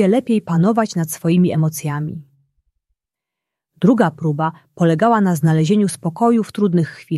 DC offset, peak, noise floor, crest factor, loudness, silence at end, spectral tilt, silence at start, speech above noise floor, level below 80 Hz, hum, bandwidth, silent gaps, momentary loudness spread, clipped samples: under 0.1%; -2 dBFS; -85 dBFS; 16 dB; -17 LUFS; 0 s; -7 dB/octave; 0 s; 68 dB; -60 dBFS; none; 14.5 kHz; none; 8 LU; under 0.1%